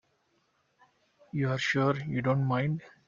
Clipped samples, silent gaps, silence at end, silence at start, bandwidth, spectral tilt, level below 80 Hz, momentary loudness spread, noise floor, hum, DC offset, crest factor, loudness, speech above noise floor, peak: under 0.1%; none; 0.2 s; 1.35 s; 7.4 kHz; -6.5 dB/octave; -66 dBFS; 6 LU; -73 dBFS; none; under 0.1%; 18 dB; -29 LUFS; 44 dB; -14 dBFS